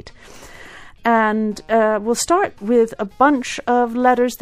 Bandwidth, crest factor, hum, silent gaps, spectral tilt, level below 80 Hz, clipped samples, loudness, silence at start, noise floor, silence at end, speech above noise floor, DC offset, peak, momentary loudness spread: 15.5 kHz; 16 dB; none; none; -4 dB/octave; -50 dBFS; under 0.1%; -17 LUFS; 0.05 s; -40 dBFS; 0.05 s; 23 dB; under 0.1%; -2 dBFS; 5 LU